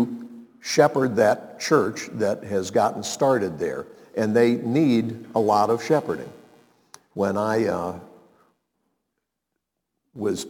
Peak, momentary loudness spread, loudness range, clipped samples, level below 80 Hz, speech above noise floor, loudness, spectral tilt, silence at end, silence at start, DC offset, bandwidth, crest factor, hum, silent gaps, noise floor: -4 dBFS; 13 LU; 7 LU; under 0.1%; -66 dBFS; 59 dB; -23 LUFS; -5.5 dB/octave; 0 s; 0 s; under 0.1%; 19 kHz; 20 dB; none; none; -81 dBFS